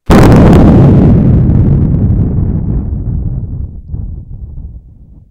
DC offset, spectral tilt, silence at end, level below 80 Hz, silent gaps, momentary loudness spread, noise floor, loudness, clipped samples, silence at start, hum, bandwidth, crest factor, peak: under 0.1%; -9 dB/octave; 0.1 s; -16 dBFS; none; 22 LU; -35 dBFS; -8 LUFS; 4%; 0.1 s; none; 15.5 kHz; 8 dB; 0 dBFS